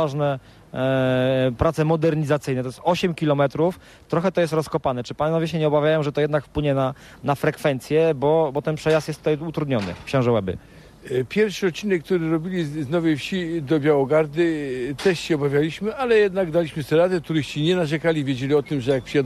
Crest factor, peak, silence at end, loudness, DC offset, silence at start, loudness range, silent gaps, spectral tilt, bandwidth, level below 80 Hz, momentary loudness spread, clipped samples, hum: 16 dB; -6 dBFS; 0 s; -22 LUFS; under 0.1%; 0 s; 2 LU; none; -6.5 dB/octave; 13.5 kHz; -48 dBFS; 6 LU; under 0.1%; none